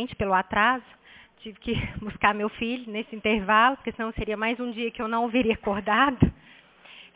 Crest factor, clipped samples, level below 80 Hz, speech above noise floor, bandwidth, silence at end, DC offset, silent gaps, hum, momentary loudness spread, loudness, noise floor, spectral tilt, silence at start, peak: 20 dB; under 0.1%; -44 dBFS; 25 dB; 4 kHz; 0.15 s; under 0.1%; none; none; 11 LU; -25 LUFS; -51 dBFS; -3.5 dB/octave; 0 s; -6 dBFS